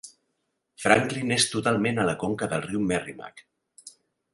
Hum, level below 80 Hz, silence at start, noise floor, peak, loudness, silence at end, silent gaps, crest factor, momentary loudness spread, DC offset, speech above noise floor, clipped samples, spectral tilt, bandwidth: none; -58 dBFS; 0.05 s; -77 dBFS; -2 dBFS; -25 LUFS; 0.45 s; none; 26 dB; 11 LU; under 0.1%; 52 dB; under 0.1%; -4 dB/octave; 11.5 kHz